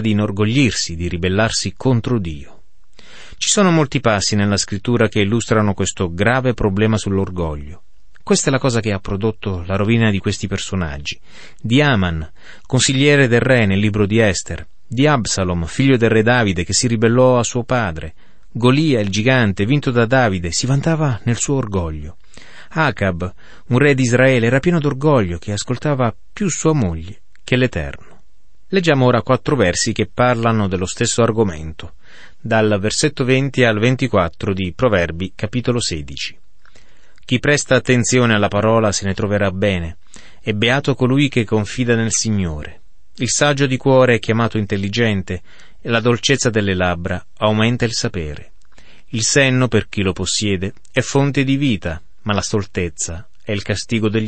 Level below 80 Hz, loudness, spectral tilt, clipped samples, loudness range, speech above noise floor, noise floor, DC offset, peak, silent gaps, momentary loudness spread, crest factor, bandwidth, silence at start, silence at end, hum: -40 dBFS; -17 LUFS; -5 dB/octave; under 0.1%; 4 LU; 39 dB; -56 dBFS; 2%; -2 dBFS; none; 12 LU; 16 dB; 8.8 kHz; 0 s; 0 s; none